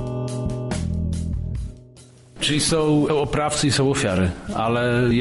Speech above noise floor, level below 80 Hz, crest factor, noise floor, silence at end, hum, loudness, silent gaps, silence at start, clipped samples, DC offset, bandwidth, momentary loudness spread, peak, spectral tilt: 27 dB; -36 dBFS; 12 dB; -47 dBFS; 0 s; none; -22 LUFS; none; 0 s; under 0.1%; under 0.1%; 11.5 kHz; 9 LU; -10 dBFS; -5 dB/octave